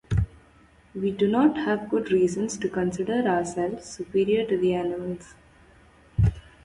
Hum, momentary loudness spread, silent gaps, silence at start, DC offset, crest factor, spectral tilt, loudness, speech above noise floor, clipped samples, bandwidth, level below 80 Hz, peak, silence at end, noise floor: none; 11 LU; none; 0.1 s; under 0.1%; 16 dB; -6.5 dB/octave; -25 LUFS; 31 dB; under 0.1%; 11.5 kHz; -40 dBFS; -10 dBFS; 0.25 s; -56 dBFS